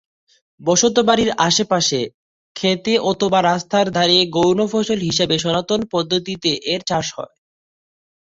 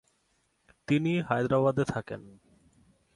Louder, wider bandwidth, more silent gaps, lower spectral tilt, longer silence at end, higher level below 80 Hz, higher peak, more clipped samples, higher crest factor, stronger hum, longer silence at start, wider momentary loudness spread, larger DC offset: first, -17 LUFS vs -28 LUFS; second, 8 kHz vs 11.5 kHz; first, 2.14-2.55 s vs none; second, -3.5 dB/octave vs -7.5 dB/octave; first, 1.15 s vs 0.85 s; first, -54 dBFS vs -62 dBFS; first, 0 dBFS vs -10 dBFS; neither; about the same, 18 dB vs 20 dB; neither; second, 0.6 s vs 0.9 s; second, 8 LU vs 17 LU; neither